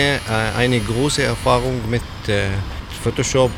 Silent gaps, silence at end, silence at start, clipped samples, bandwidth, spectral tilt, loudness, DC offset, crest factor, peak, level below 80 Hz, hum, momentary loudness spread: none; 0 s; 0 s; under 0.1%; 16.5 kHz; -4.5 dB/octave; -19 LUFS; under 0.1%; 18 dB; -2 dBFS; -32 dBFS; none; 6 LU